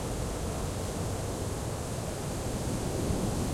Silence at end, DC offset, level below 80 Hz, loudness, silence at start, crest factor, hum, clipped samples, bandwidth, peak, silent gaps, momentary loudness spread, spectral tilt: 0 s; under 0.1%; -40 dBFS; -34 LUFS; 0 s; 14 dB; none; under 0.1%; 16.5 kHz; -18 dBFS; none; 4 LU; -5 dB/octave